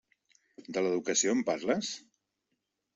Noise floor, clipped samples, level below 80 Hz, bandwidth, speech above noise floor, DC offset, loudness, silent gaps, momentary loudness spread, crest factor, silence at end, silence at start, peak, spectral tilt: -83 dBFS; under 0.1%; -76 dBFS; 8.2 kHz; 52 dB; under 0.1%; -31 LUFS; none; 11 LU; 20 dB; 0.95 s; 0.6 s; -14 dBFS; -3 dB/octave